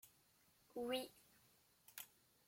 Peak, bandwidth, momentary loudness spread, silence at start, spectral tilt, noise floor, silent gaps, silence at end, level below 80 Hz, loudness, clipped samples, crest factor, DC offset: -32 dBFS; 16.5 kHz; 23 LU; 0.05 s; -2.5 dB/octave; -76 dBFS; none; 0.4 s; -86 dBFS; -50 LUFS; under 0.1%; 22 dB; under 0.1%